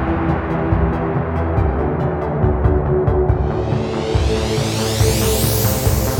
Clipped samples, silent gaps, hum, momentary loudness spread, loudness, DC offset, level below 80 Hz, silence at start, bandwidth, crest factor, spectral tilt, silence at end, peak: under 0.1%; none; none; 4 LU; -18 LUFS; under 0.1%; -24 dBFS; 0 s; over 20 kHz; 14 dB; -5.5 dB/octave; 0 s; -2 dBFS